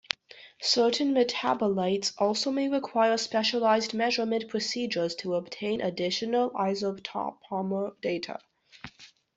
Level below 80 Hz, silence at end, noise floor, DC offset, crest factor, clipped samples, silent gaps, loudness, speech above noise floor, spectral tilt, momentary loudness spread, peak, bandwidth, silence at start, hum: -72 dBFS; 0.3 s; -53 dBFS; under 0.1%; 26 dB; under 0.1%; none; -28 LUFS; 26 dB; -4 dB/octave; 10 LU; -4 dBFS; 8.2 kHz; 0.35 s; none